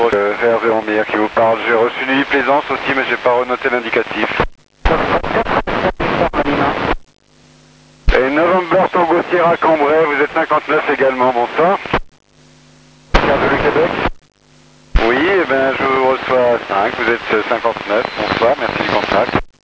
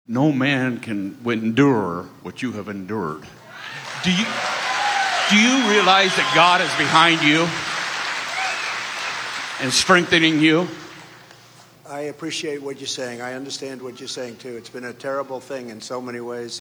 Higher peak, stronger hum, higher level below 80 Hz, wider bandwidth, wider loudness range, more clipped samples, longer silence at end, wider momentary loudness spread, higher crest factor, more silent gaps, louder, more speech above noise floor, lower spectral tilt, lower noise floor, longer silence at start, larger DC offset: about the same, 0 dBFS vs 0 dBFS; neither; first, -28 dBFS vs -62 dBFS; second, 8 kHz vs over 20 kHz; second, 3 LU vs 14 LU; neither; first, 0.15 s vs 0 s; second, 5 LU vs 18 LU; second, 14 dB vs 20 dB; neither; first, -15 LUFS vs -19 LUFS; first, 32 dB vs 28 dB; first, -6 dB/octave vs -3.5 dB/octave; about the same, -47 dBFS vs -48 dBFS; about the same, 0 s vs 0.1 s; neither